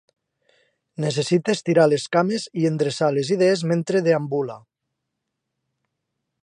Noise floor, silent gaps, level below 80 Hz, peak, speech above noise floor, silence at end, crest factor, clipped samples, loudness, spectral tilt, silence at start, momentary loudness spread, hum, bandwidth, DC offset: -80 dBFS; none; -70 dBFS; -4 dBFS; 60 dB; 1.85 s; 18 dB; under 0.1%; -21 LUFS; -6 dB/octave; 1 s; 9 LU; none; 11 kHz; under 0.1%